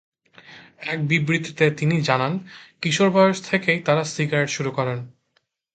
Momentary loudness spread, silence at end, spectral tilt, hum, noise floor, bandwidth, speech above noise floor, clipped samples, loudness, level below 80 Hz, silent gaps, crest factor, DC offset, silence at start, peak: 10 LU; 0.65 s; -5.5 dB/octave; none; -69 dBFS; 9.2 kHz; 48 dB; under 0.1%; -21 LUFS; -64 dBFS; none; 20 dB; under 0.1%; 0.5 s; -2 dBFS